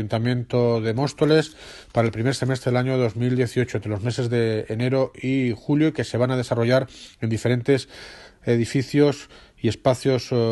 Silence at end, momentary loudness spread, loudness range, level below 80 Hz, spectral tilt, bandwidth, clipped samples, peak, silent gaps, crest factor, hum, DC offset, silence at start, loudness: 0 s; 7 LU; 1 LU; -54 dBFS; -6.5 dB/octave; 12 kHz; under 0.1%; -4 dBFS; none; 18 dB; none; under 0.1%; 0 s; -22 LUFS